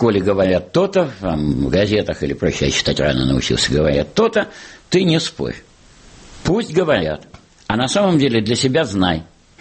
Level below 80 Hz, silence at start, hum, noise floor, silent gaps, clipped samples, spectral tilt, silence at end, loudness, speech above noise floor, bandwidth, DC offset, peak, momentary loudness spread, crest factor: -36 dBFS; 0 s; none; -45 dBFS; none; under 0.1%; -5 dB/octave; 0.4 s; -17 LUFS; 28 dB; 8.8 kHz; under 0.1%; -4 dBFS; 10 LU; 14 dB